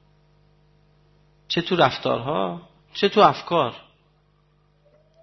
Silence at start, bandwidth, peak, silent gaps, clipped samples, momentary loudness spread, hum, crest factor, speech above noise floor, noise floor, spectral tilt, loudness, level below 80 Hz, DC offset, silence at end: 1.5 s; 6.2 kHz; -2 dBFS; none; under 0.1%; 16 LU; 50 Hz at -55 dBFS; 22 dB; 41 dB; -62 dBFS; -6 dB/octave; -21 LUFS; -60 dBFS; under 0.1%; 1.4 s